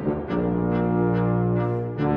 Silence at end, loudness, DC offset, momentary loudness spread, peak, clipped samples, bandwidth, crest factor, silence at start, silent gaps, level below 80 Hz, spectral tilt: 0 s; -23 LUFS; under 0.1%; 4 LU; -10 dBFS; under 0.1%; 5 kHz; 14 dB; 0 s; none; -42 dBFS; -11.5 dB/octave